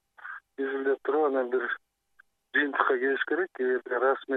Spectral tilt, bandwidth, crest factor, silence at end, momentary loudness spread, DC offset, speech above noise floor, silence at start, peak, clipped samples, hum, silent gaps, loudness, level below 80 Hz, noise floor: -5.5 dB/octave; 4.1 kHz; 20 dB; 0 s; 11 LU; under 0.1%; 37 dB; 0.2 s; -8 dBFS; under 0.1%; none; none; -28 LUFS; -86 dBFS; -65 dBFS